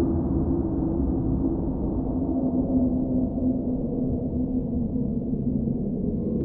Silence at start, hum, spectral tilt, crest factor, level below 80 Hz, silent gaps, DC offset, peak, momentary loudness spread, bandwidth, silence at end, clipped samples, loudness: 0 s; none; -15 dB/octave; 14 dB; -34 dBFS; none; under 0.1%; -12 dBFS; 3 LU; 1.7 kHz; 0 s; under 0.1%; -26 LUFS